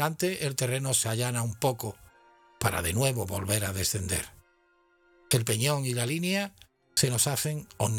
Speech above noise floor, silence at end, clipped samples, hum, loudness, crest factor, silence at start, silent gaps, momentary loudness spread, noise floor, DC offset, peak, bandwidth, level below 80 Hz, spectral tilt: 38 dB; 0 s; under 0.1%; none; -28 LUFS; 22 dB; 0 s; none; 6 LU; -66 dBFS; under 0.1%; -8 dBFS; 19.5 kHz; -54 dBFS; -3.5 dB/octave